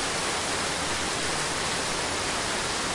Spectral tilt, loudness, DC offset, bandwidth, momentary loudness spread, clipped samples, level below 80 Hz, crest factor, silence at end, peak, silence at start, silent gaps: -1.5 dB/octave; -27 LUFS; under 0.1%; 11.5 kHz; 0 LU; under 0.1%; -48 dBFS; 14 dB; 0 s; -14 dBFS; 0 s; none